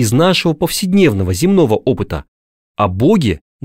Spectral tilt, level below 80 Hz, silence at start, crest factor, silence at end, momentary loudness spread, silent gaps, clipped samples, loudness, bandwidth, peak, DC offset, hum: -5.5 dB/octave; -38 dBFS; 0 s; 12 dB; 0.25 s; 8 LU; 2.28-2.75 s; under 0.1%; -14 LUFS; 16.5 kHz; 0 dBFS; 0.5%; none